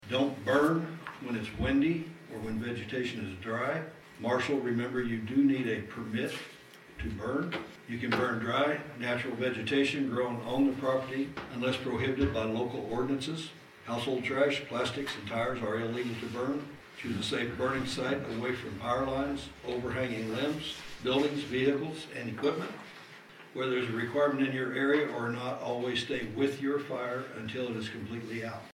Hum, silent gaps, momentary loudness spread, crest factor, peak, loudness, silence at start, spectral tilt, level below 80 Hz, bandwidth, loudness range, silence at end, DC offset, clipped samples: none; none; 10 LU; 18 dB; -14 dBFS; -32 LUFS; 0 s; -5.5 dB/octave; -56 dBFS; 15.5 kHz; 3 LU; 0 s; under 0.1%; under 0.1%